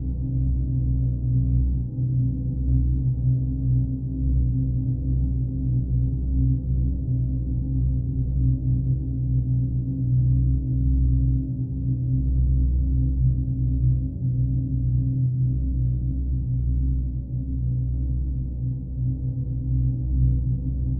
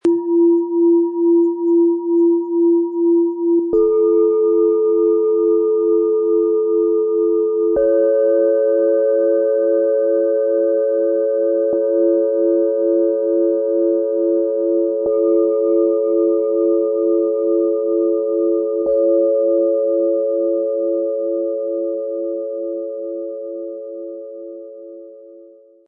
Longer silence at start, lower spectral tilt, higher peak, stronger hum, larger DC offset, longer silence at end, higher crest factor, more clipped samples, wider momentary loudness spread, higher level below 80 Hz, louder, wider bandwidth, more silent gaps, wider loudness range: about the same, 0 s vs 0.05 s; first, -16.5 dB/octave vs -9 dB/octave; second, -10 dBFS vs -6 dBFS; neither; neither; second, 0 s vs 0.45 s; about the same, 12 dB vs 10 dB; neither; second, 5 LU vs 9 LU; first, -26 dBFS vs -60 dBFS; second, -24 LUFS vs -16 LUFS; second, 0.9 kHz vs 1.6 kHz; neither; second, 3 LU vs 7 LU